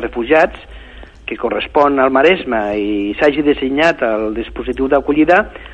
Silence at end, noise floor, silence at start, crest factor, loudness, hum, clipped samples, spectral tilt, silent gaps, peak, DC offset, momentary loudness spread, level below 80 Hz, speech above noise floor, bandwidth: 0 s; -36 dBFS; 0 s; 14 dB; -14 LUFS; none; under 0.1%; -6 dB/octave; none; 0 dBFS; under 0.1%; 11 LU; -38 dBFS; 22 dB; 8.4 kHz